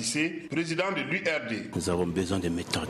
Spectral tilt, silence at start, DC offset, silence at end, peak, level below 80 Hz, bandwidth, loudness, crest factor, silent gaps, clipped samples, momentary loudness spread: -4 dB/octave; 0 s; under 0.1%; 0 s; -12 dBFS; -54 dBFS; 14 kHz; -29 LUFS; 18 dB; none; under 0.1%; 3 LU